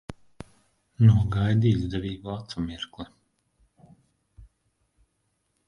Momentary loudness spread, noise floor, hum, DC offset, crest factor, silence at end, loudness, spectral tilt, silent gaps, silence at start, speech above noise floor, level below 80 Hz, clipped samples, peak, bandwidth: 24 LU; -74 dBFS; none; under 0.1%; 22 dB; 1.25 s; -25 LUFS; -8 dB/octave; none; 0.1 s; 51 dB; -46 dBFS; under 0.1%; -6 dBFS; 6.8 kHz